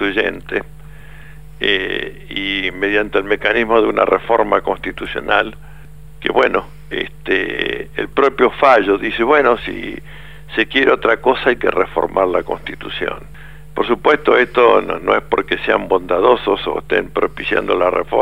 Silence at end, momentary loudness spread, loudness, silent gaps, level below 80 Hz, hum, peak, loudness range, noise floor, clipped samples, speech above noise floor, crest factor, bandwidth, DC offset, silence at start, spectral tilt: 0 s; 11 LU; -16 LUFS; none; -40 dBFS; none; 0 dBFS; 4 LU; -38 dBFS; under 0.1%; 22 dB; 16 dB; 15.5 kHz; 1%; 0 s; -5.5 dB/octave